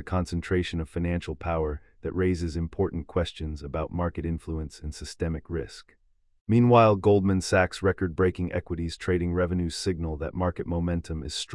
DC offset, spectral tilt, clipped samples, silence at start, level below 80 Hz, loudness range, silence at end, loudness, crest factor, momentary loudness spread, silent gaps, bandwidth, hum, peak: under 0.1%; -6.5 dB/octave; under 0.1%; 0 s; -44 dBFS; 8 LU; 0 s; -27 LUFS; 22 dB; 13 LU; 6.41-6.46 s; 12 kHz; none; -6 dBFS